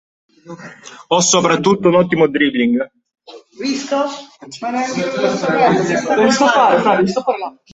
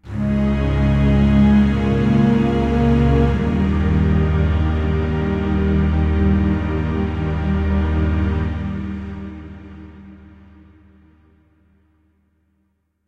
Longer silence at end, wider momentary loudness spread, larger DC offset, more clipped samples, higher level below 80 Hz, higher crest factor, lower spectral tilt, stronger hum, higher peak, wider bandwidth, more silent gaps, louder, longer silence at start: second, 0.25 s vs 2.9 s; first, 16 LU vs 12 LU; neither; neither; second, -56 dBFS vs -24 dBFS; about the same, 16 dB vs 14 dB; second, -4 dB/octave vs -9 dB/octave; neither; first, 0 dBFS vs -4 dBFS; first, 8.2 kHz vs 6.4 kHz; neither; first, -15 LUFS vs -18 LUFS; first, 0.45 s vs 0.05 s